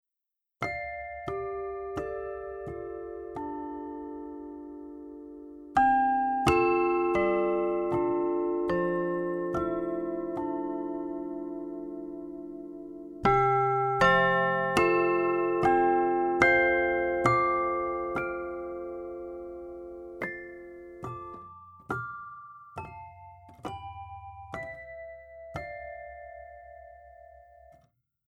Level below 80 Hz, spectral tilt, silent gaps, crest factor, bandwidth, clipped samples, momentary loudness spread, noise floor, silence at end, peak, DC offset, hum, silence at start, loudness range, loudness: -54 dBFS; -6.5 dB/octave; none; 22 dB; 11.5 kHz; under 0.1%; 20 LU; -87 dBFS; 1 s; -8 dBFS; under 0.1%; none; 0.6 s; 17 LU; -28 LUFS